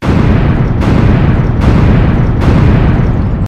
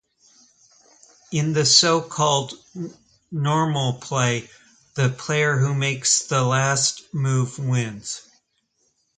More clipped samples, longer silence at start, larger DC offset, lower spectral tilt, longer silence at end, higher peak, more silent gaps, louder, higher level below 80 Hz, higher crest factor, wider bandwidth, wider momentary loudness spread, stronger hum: first, 0.3% vs under 0.1%; second, 0 s vs 1.3 s; neither; first, -9 dB/octave vs -3.5 dB/octave; second, 0 s vs 1 s; about the same, 0 dBFS vs -2 dBFS; neither; first, -9 LUFS vs -21 LUFS; first, -14 dBFS vs -60 dBFS; second, 8 dB vs 22 dB; second, 8.2 kHz vs 9.6 kHz; second, 3 LU vs 17 LU; neither